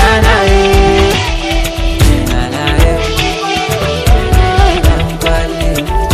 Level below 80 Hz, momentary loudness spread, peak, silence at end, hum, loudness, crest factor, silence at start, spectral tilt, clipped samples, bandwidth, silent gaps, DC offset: -14 dBFS; 6 LU; 0 dBFS; 0 s; none; -11 LUFS; 10 dB; 0 s; -5 dB/octave; 0.9%; 15 kHz; none; under 0.1%